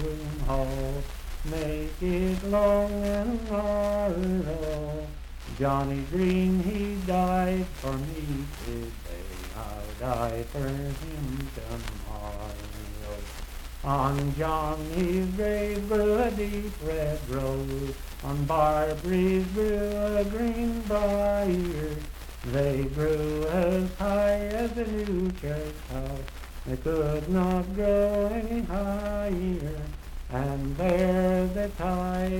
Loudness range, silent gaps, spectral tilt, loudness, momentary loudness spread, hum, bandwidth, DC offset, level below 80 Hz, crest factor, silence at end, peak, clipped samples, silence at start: 7 LU; none; -7 dB/octave; -29 LUFS; 13 LU; none; 18 kHz; under 0.1%; -36 dBFS; 16 dB; 0 s; -12 dBFS; under 0.1%; 0 s